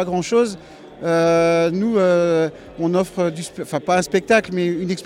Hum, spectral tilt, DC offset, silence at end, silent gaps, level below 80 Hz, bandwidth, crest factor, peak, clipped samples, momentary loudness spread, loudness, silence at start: none; -5.5 dB/octave; under 0.1%; 0 s; none; -54 dBFS; 15 kHz; 16 dB; -4 dBFS; under 0.1%; 9 LU; -19 LUFS; 0 s